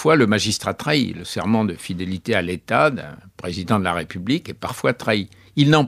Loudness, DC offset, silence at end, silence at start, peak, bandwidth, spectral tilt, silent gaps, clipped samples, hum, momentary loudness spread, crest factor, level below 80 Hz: -21 LUFS; under 0.1%; 0 s; 0 s; -2 dBFS; 15 kHz; -5 dB/octave; none; under 0.1%; none; 11 LU; 18 dB; -52 dBFS